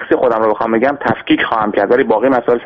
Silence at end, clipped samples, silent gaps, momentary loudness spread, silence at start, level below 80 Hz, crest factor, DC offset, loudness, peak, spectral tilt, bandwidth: 0 s; under 0.1%; none; 2 LU; 0 s; -48 dBFS; 12 dB; under 0.1%; -14 LUFS; 0 dBFS; -8 dB/octave; 5.8 kHz